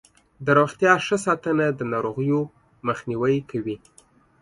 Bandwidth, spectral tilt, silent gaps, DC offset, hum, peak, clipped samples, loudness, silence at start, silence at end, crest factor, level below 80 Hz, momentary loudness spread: 11.5 kHz; -6 dB/octave; none; under 0.1%; none; -4 dBFS; under 0.1%; -23 LUFS; 0.4 s; 0.65 s; 20 dB; -60 dBFS; 12 LU